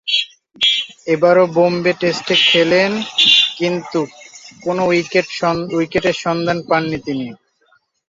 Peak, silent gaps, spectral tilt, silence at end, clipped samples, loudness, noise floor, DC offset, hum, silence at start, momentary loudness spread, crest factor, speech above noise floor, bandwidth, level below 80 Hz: 0 dBFS; none; -4 dB/octave; 0.75 s; under 0.1%; -15 LUFS; -58 dBFS; under 0.1%; none; 0.05 s; 12 LU; 16 dB; 43 dB; 7.8 kHz; -54 dBFS